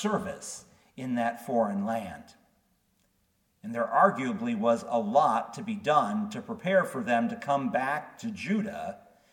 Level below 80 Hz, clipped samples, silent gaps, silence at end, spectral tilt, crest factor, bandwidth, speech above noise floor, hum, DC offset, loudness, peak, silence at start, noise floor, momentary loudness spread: -70 dBFS; under 0.1%; none; 0.35 s; -5.5 dB/octave; 22 dB; 17.5 kHz; 43 dB; none; under 0.1%; -29 LUFS; -8 dBFS; 0 s; -72 dBFS; 15 LU